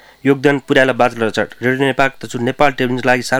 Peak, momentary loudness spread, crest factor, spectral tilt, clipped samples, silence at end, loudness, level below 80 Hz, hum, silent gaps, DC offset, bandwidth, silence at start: 0 dBFS; 5 LU; 16 dB; -5.5 dB/octave; under 0.1%; 0 s; -15 LUFS; -46 dBFS; none; none; under 0.1%; 16.5 kHz; 0.25 s